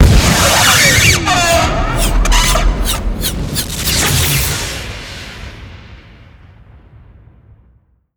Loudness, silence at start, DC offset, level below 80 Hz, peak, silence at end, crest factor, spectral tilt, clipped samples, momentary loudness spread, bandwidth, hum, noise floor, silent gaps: -11 LUFS; 0 s; under 0.1%; -20 dBFS; 0 dBFS; 2.2 s; 12 dB; -3 dB/octave; under 0.1%; 20 LU; over 20 kHz; none; -52 dBFS; none